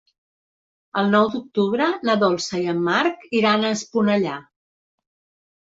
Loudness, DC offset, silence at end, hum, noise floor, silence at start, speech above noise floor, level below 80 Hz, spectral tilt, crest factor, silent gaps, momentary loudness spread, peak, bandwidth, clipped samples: -21 LUFS; under 0.1%; 1.2 s; none; under -90 dBFS; 0.95 s; over 70 dB; -66 dBFS; -5 dB/octave; 18 dB; none; 5 LU; -4 dBFS; 7.8 kHz; under 0.1%